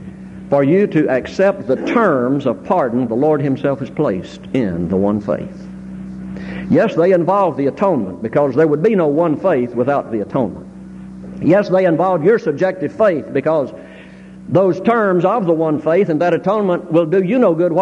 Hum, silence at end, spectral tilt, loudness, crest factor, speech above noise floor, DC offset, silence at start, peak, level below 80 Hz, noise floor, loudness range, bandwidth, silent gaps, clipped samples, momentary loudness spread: none; 0 s; -8.5 dB/octave; -16 LUFS; 14 dB; 22 dB; under 0.1%; 0 s; -2 dBFS; -48 dBFS; -37 dBFS; 3 LU; 10 kHz; none; under 0.1%; 15 LU